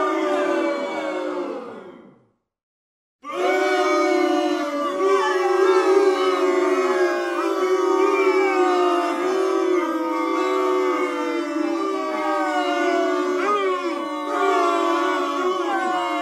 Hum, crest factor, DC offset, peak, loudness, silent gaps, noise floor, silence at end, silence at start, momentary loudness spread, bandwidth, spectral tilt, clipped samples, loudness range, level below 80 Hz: none; 16 dB; under 0.1%; -6 dBFS; -21 LUFS; 2.63-3.19 s; -60 dBFS; 0 s; 0 s; 7 LU; 13 kHz; -2.5 dB/octave; under 0.1%; 5 LU; -78 dBFS